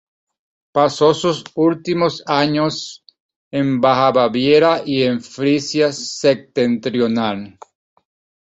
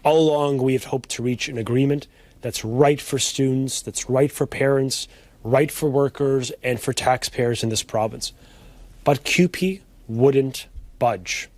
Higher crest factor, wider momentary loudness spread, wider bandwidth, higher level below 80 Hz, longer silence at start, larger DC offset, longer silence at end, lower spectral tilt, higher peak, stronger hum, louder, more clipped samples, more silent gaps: about the same, 16 dB vs 20 dB; about the same, 8 LU vs 9 LU; second, 8.2 kHz vs 15.5 kHz; second, -58 dBFS vs -48 dBFS; first, 0.75 s vs 0.05 s; neither; first, 0.95 s vs 0.1 s; about the same, -5 dB/octave vs -5 dB/octave; about the same, -2 dBFS vs -2 dBFS; neither; first, -17 LUFS vs -22 LUFS; neither; first, 3.20-3.29 s, 3.36-3.51 s vs none